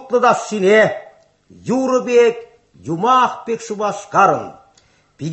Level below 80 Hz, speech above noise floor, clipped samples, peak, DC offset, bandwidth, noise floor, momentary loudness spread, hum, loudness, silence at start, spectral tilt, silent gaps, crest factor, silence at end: -62 dBFS; 39 dB; under 0.1%; -2 dBFS; under 0.1%; 8.4 kHz; -55 dBFS; 18 LU; none; -16 LUFS; 0 s; -5 dB/octave; none; 16 dB; 0 s